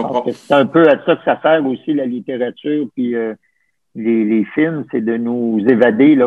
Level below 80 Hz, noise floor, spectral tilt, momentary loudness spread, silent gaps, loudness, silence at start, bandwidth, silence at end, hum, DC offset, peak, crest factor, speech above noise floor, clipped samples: -64 dBFS; -65 dBFS; -8 dB/octave; 10 LU; none; -15 LUFS; 0 s; 6.4 kHz; 0 s; none; under 0.1%; 0 dBFS; 14 dB; 51 dB; under 0.1%